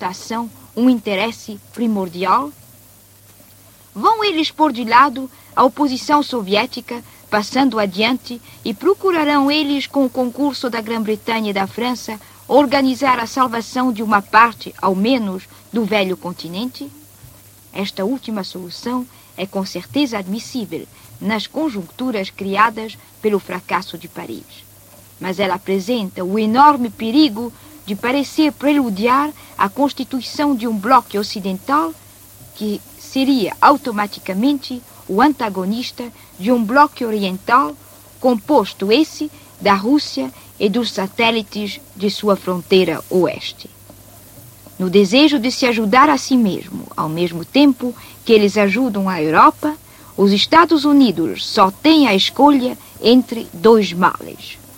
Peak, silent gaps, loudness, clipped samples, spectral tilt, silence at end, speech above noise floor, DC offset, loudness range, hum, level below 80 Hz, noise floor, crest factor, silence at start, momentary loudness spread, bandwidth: 0 dBFS; none; -16 LUFS; under 0.1%; -5 dB/octave; 0.2 s; 30 dB; under 0.1%; 9 LU; none; -56 dBFS; -46 dBFS; 18 dB; 0 s; 15 LU; 17 kHz